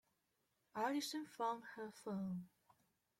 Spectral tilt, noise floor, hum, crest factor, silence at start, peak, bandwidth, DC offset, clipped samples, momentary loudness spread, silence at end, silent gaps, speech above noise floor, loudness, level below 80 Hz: -4.5 dB/octave; -85 dBFS; none; 18 dB; 0.75 s; -30 dBFS; 16.5 kHz; under 0.1%; under 0.1%; 11 LU; 0.7 s; none; 41 dB; -45 LUFS; -86 dBFS